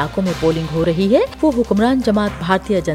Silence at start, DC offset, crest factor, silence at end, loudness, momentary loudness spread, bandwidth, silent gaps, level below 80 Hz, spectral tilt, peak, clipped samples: 0 s; under 0.1%; 16 dB; 0 s; -17 LUFS; 4 LU; 15.5 kHz; none; -36 dBFS; -6.5 dB/octave; 0 dBFS; under 0.1%